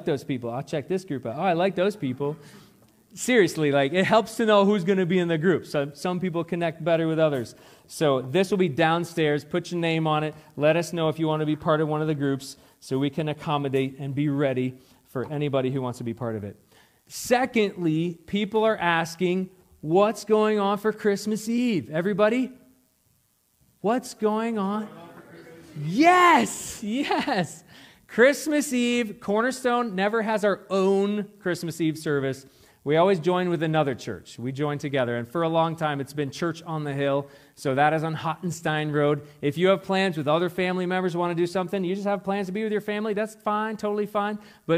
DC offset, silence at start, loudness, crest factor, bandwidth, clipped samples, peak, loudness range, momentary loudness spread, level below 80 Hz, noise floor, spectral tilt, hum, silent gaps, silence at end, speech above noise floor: under 0.1%; 0 s; -25 LUFS; 20 dB; 16 kHz; under 0.1%; -4 dBFS; 5 LU; 10 LU; -66 dBFS; -67 dBFS; -5.5 dB/octave; none; none; 0 s; 42 dB